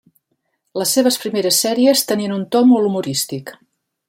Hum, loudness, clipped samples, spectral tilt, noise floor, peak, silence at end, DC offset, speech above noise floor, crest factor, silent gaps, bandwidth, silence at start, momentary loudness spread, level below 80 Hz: none; -16 LUFS; under 0.1%; -3.5 dB/octave; -70 dBFS; -2 dBFS; 0.55 s; under 0.1%; 54 dB; 16 dB; none; 16.5 kHz; 0.75 s; 11 LU; -66 dBFS